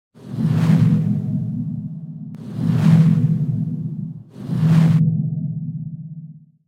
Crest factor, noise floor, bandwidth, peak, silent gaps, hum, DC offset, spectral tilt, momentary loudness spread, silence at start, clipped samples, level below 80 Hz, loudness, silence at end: 16 dB; -39 dBFS; 6.6 kHz; -2 dBFS; none; none; under 0.1%; -9 dB/octave; 18 LU; 0.2 s; under 0.1%; -52 dBFS; -19 LUFS; 0.3 s